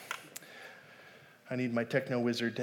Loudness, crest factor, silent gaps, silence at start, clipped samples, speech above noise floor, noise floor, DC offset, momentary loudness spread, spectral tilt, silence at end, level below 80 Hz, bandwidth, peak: -34 LUFS; 20 dB; none; 0 s; under 0.1%; 24 dB; -57 dBFS; under 0.1%; 22 LU; -5.5 dB/octave; 0 s; -86 dBFS; 19 kHz; -16 dBFS